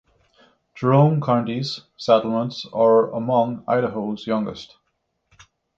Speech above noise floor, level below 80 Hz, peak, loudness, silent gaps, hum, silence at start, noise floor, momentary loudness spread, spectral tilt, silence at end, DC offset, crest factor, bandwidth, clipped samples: 53 dB; -62 dBFS; -2 dBFS; -21 LUFS; none; none; 0.75 s; -73 dBFS; 11 LU; -8 dB/octave; 1.1 s; under 0.1%; 18 dB; 7.6 kHz; under 0.1%